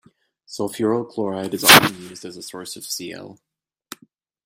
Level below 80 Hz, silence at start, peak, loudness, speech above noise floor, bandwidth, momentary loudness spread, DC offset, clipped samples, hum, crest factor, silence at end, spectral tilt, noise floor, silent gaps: -60 dBFS; 0.5 s; 0 dBFS; -17 LUFS; 37 dB; 16 kHz; 25 LU; under 0.1%; under 0.1%; none; 22 dB; 1.15 s; -2 dB/octave; -57 dBFS; none